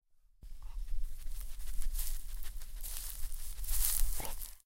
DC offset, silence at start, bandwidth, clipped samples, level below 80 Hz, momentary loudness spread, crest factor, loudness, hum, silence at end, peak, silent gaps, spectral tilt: under 0.1%; 0.45 s; 17 kHz; under 0.1%; -38 dBFS; 16 LU; 22 dB; -40 LUFS; none; 0.05 s; -12 dBFS; none; -1.5 dB/octave